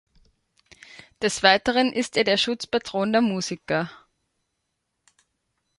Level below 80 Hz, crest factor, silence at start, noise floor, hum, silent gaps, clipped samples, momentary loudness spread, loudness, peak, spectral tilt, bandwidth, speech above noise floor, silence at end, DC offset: -60 dBFS; 24 dB; 1.2 s; -78 dBFS; none; none; under 0.1%; 9 LU; -22 LUFS; -2 dBFS; -3.5 dB/octave; 11.5 kHz; 55 dB; 1.85 s; under 0.1%